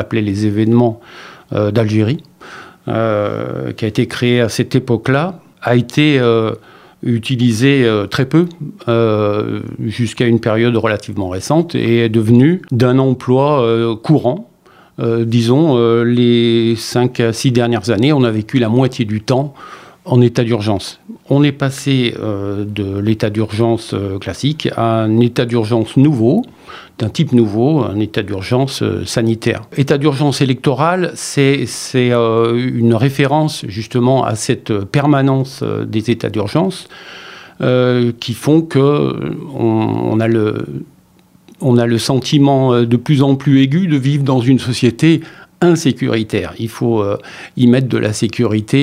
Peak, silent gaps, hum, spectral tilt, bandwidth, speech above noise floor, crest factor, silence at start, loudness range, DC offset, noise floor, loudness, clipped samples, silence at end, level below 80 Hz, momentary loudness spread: 0 dBFS; none; none; -6.5 dB/octave; 15.5 kHz; 35 dB; 14 dB; 0 s; 4 LU; under 0.1%; -49 dBFS; -14 LUFS; under 0.1%; 0 s; -52 dBFS; 10 LU